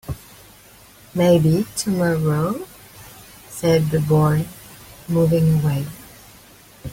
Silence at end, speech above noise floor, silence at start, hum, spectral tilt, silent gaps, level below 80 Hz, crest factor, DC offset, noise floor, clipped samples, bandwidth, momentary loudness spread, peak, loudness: 0 s; 29 dB; 0.05 s; none; -7 dB/octave; none; -46 dBFS; 16 dB; under 0.1%; -47 dBFS; under 0.1%; 16.5 kHz; 24 LU; -4 dBFS; -19 LUFS